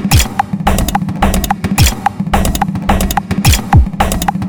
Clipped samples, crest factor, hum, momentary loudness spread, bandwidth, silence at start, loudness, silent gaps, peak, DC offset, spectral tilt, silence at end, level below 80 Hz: under 0.1%; 12 dB; none; 5 LU; over 20 kHz; 0 s; -13 LUFS; none; 0 dBFS; under 0.1%; -4.5 dB/octave; 0 s; -18 dBFS